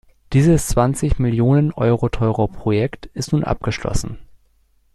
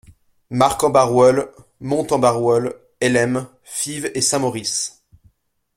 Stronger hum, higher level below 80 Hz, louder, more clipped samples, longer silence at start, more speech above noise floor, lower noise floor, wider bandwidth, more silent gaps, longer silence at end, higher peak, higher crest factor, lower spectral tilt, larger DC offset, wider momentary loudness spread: neither; first, -30 dBFS vs -52 dBFS; about the same, -19 LUFS vs -18 LUFS; neither; second, 0.3 s vs 0.5 s; about the same, 41 dB vs 41 dB; about the same, -58 dBFS vs -59 dBFS; second, 13.5 kHz vs 16.5 kHz; neither; second, 0.7 s vs 0.9 s; about the same, -2 dBFS vs 0 dBFS; about the same, 16 dB vs 18 dB; first, -7 dB/octave vs -4 dB/octave; neither; second, 9 LU vs 13 LU